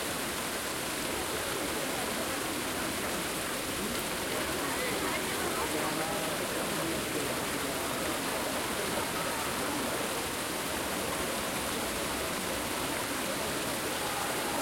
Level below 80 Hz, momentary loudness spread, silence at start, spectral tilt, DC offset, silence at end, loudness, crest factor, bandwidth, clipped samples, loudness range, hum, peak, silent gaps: -54 dBFS; 2 LU; 0 s; -2.5 dB/octave; under 0.1%; 0 s; -32 LUFS; 14 dB; 16.5 kHz; under 0.1%; 1 LU; none; -18 dBFS; none